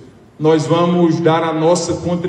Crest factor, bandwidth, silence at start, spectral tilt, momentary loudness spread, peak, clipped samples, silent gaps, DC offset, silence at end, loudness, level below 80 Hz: 14 dB; 10 kHz; 0 s; -6 dB/octave; 4 LU; 0 dBFS; under 0.1%; none; under 0.1%; 0 s; -15 LUFS; -54 dBFS